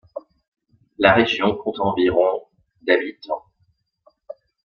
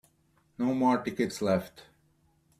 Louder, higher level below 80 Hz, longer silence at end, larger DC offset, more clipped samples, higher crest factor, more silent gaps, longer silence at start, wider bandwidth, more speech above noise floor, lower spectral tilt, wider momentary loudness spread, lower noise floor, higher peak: first, -20 LUFS vs -29 LUFS; first, -54 dBFS vs -66 dBFS; second, 0.35 s vs 0.75 s; neither; neither; about the same, 20 dB vs 18 dB; first, 0.48-0.52 s vs none; second, 0.15 s vs 0.6 s; second, 6.8 kHz vs 14.5 kHz; first, 47 dB vs 40 dB; about the same, -6 dB/octave vs -6 dB/octave; first, 23 LU vs 6 LU; about the same, -66 dBFS vs -68 dBFS; first, -2 dBFS vs -14 dBFS